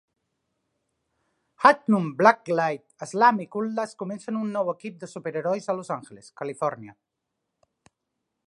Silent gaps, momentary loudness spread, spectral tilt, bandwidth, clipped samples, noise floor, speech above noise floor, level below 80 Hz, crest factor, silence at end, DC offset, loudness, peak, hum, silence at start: none; 16 LU; -6 dB/octave; 11 kHz; under 0.1%; -82 dBFS; 57 dB; -78 dBFS; 24 dB; 1.55 s; under 0.1%; -24 LUFS; -2 dBFS; none; 1.6 s